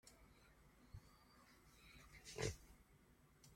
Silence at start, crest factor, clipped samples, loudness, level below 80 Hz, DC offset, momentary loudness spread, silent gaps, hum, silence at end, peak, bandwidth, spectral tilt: 0.05 s; 28 dB; under 0.1%; -53 LUFS; -68 dBFS; under 0.1%; 21 LU; none; none; 0 s; -30 dBFS; 16.5 kHz; -4 dB/octave